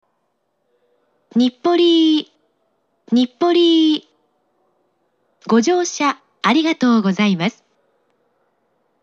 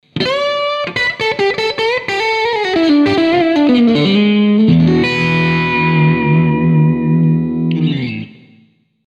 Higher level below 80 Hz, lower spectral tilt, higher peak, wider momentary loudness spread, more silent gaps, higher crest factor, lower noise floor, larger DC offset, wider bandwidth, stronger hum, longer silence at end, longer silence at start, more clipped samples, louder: second, -80 dBFS vs -44 dBFS; second, -4.5 dB/octave vs -7 dB/octave; about the same, -4 dBFS vs -2 dBFS; about the same, 8 LU vs 6 LU; neither; about the same, 16 dB vs 12 dB; first, -69 dBFS vs -51 dBFS; neither; about the same, 7.6 kHz vs 8 kHz; neither; first, 1.5 s vs 0.8 s; first, 1.35 s vs 0.15 s; neither; second, -16 LUFS vs -13 LUFS